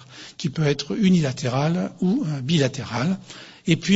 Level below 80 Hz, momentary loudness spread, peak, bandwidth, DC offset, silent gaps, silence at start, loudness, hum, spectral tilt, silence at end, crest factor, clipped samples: -56 dBFS; 11 LU; -2 dBFS; 8 kHz; under 0.1%; none; 0 s; -23 LUFS; none; -6 dB/octave; 0 s; 20 dB; under 0.1%